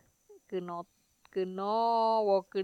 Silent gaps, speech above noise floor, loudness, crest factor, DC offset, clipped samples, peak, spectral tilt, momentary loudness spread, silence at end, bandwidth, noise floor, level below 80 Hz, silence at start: none; 30 dB; -31 LUFS; 16 dB; under 0.1%; under 0.1%; -16 dBFS; -7 dB/octave; 14 LU; 0 s; 9.4 kHz; -61 dBFS; -80 dBFS; 0.3 s